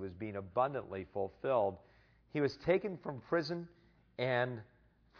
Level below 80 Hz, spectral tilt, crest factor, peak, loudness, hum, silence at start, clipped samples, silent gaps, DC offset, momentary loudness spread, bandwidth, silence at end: -68 dBFS; -5 dB/octave; 20 dB; -18 dBFS; -37 LUFS; none; 0 s; under 0.1%; none; under 0.1%; 11 LU; 5.4 kHz; 0.55 s